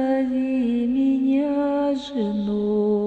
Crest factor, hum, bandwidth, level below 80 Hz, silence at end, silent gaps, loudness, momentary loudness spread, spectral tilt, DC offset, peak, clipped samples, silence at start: 10 dB; none; 7.8 kHz; -54 dBFS; 0 s; none; -22 LUFS; 4 LU; -8 dB/octave; under 0.1%; -12 dBFS; under 0.1%; 0 s